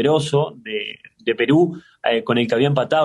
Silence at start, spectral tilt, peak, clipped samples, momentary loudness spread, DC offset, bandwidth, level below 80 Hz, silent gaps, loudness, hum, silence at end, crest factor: 0 s; -6.5 dB/octave; -4 dBFS; under 0.1%; 10 LU; under 0.1%; 11.5 kHz; -62 dBFS; none; -20 LUFS; none; 0 s; 14 dB